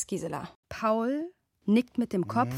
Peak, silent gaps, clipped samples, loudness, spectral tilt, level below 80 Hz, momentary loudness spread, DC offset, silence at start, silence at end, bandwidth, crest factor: -12 dBFS; 0.56-0.63 s; under 0.1%; -30 LUFS; -6 dB/octave; -64 dBFS; 13 LU; under 0.1%; 0 s; 0 s; 14.5 kHz; 16 dB